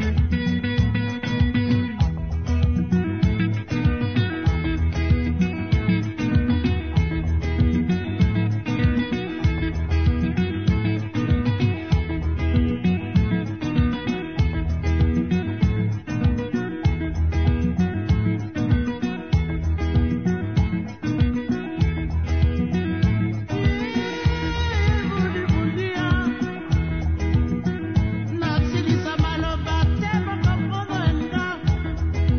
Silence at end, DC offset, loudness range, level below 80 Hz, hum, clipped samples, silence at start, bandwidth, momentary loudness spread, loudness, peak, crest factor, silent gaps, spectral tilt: 0 s; 0.4%; 1 LU; -28 dBFS; none; under 0.1%; 0 s; 6.6 kHz; 4 LU; -23 LUFS; -8 dBFS; 14 dB; none; -7.5 dB/octave